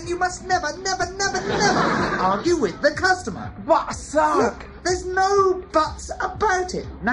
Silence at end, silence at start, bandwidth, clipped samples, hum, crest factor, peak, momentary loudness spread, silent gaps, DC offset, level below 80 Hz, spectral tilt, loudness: 0 s; 0 s; 11 kHz; under 0.1%; none; 16 dB; -6 dBFS; 8 LU; none; under 0.1%; -42 dBFS; -4 dB/octave; -21 LUFS